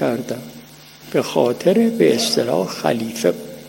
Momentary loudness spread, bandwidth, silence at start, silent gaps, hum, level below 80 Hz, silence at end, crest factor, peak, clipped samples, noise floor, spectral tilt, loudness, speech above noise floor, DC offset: 11 LU; 16.5 kHz; 0 s; none; 50 Hz at -45 dBFS; -60 dBFS; 0 s; 18 dB; -2 dBFS; under 0.1%; -41 dBFS; -4.5 dB/octave; -18 LUFS; 23 dB; under 0.1%